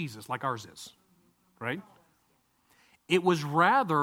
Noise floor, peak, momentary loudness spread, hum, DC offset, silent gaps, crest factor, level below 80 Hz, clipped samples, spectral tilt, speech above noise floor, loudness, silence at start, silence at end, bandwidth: -70 dBFS; -10 dBFS; 21 LU; none; under 0.1%; none; 22 dB; -74 dBFS; under 0.1%; -5.5 dB/octave; 42 dB; -28 LUFS; 0 s; 0 s; 16.5 kHz